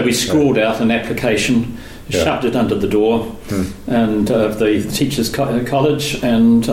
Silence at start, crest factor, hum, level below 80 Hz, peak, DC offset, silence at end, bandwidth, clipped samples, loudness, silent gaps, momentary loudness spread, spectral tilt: 0 s; 12 dB; none; -38 dBFS; -4 dBFS; under 0.1%; 0 s; 16.5 kHz; under 0.1%; -16 LUFS; none; 8 LU; -5 dB/octave